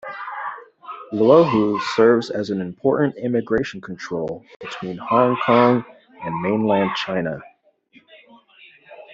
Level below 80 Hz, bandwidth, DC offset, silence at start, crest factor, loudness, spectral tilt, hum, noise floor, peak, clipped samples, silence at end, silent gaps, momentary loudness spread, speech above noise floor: -58 dBFS; 7.8 kHz; under 0.1%; 0.05 s; 18 dB; -20 LUFS; -7 dB/octave; none; -55 dBFS; -2 dBFS; under 0.1%; 0 s; 4.56-4.60 s; 18 LU; 36 dB